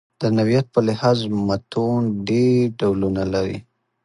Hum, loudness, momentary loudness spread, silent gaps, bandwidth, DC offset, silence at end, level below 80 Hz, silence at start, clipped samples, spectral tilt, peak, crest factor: none; -20 LUFS; 5 LU; none; 11 kHz; under 0.1%; 0.45 s; -46 dBFS; 0.2 s; under 0.1%; -7.5 dB/octave; -4 dBFS; 16 dB